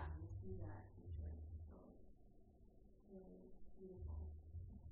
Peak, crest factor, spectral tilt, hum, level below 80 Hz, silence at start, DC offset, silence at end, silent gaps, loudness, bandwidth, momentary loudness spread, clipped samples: -38 dBFS; 16 dB; -8 dB/octave; none; -58 dBFS; 0 s; under 0.1%; 0 s; none; -56 LUFS; 2.1 kHz; 12 LU; under 0.1%